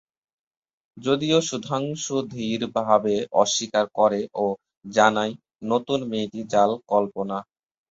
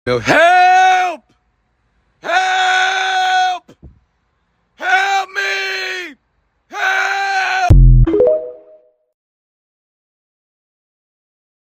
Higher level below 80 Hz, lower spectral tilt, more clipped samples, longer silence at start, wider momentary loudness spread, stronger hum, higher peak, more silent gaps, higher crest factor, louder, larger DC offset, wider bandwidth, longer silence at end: second, -64 dBFS vs -22 dBFS; about the same, -4 dB/octave vs -4.5 dB/octave; neither; first, 0.95 s vs 0.05 s; second, 9 LU vs 15 LU; neither; about the same, -2 dBFS vs 0 dBFS; first, 4.77-4.81 s vs none; first, 22 dB vs 16 dB; second, -23 LUFS vs -13 LUFS; neither; second, 8 kHz vs 15 kHz; second, 0.5 s vs 3.1 s